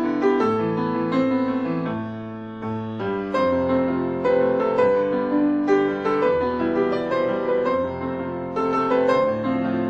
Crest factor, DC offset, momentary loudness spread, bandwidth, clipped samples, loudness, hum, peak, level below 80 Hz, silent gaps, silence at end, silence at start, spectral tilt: 14 dB; under 0.1%; 8 LU; 7.4 kHz; under 0.1%; -22 LUFS; none; -6 dBFS; -54 dBFS; none; 0 s; 0 s; -8 dB/octave